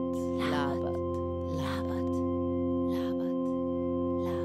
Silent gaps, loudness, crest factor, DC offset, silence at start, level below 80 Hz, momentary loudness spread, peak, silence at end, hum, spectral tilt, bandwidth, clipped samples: none; -32 LUFS; 14 dB; under 0.1%; 0 s; -52 dBFS; 3 LU; -18 dBFS; 0 s; none; -7.5 dB/octave; 13 kHz; under 0.1%